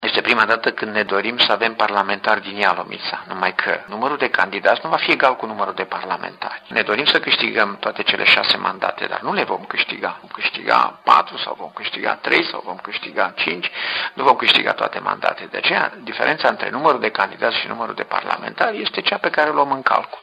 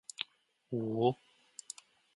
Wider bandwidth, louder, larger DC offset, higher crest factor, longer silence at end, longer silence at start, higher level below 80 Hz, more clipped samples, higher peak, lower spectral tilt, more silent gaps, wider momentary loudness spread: about the same, 12 kHz vs 11.5 kHz; first, -18 LUFS vs -37 LUFS; neither; about the same, 20 dB vs 22 dB; second, 0 s vs 1 s; second, 0 s vs 0.2 s; first, -68 dBFS vs -80 dBFS; neither; first, 0 dBFS vs -16 dBFS; second, -4 dB/octave vs -5.5 dB/octave; neither; second, 10 LU vs 18 LU